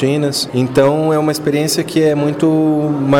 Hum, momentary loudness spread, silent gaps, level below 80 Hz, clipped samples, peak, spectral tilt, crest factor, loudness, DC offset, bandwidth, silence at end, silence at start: none; 3 LU; none; -50 dBFS; under 0.1%; -2 dBFS; -5.5 dB/octave; 10 dB; -14 LUFS; under 0.1%; 17.5 kHz; 0 s; 0 s